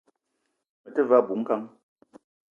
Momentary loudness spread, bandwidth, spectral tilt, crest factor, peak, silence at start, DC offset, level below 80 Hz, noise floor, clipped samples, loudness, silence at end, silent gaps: 11 LU; 3.4 kHz; -8.5 dB/octave; 22 dB; -6 dBFS; 0.85 s; under 0.1%; -84 dBFS; -78 dBFS; under 0.1%; -24 LUFS; 0.85 s; none